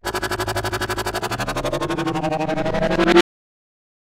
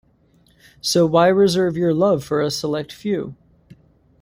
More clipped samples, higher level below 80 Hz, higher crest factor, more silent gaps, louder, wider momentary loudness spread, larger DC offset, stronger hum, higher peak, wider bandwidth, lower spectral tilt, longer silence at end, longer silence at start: neither; first, -38 dBFS vs -56 dBFS; about the same, 20 dB vs 18 dB; neither; about the same, -21 LUFS vs -19 LUFS; second, 8 LU vs 11 LU; neither; neither; about the same, 0 dBFS vs -2 dBFS; about the same, 16.5 kHz vs 16 kHz; about the same, -5 dB/octave vs -5.5 dB/octave; about the same, 0.8 s vs 0.9 s; second, 0.05 s vs 0.85 s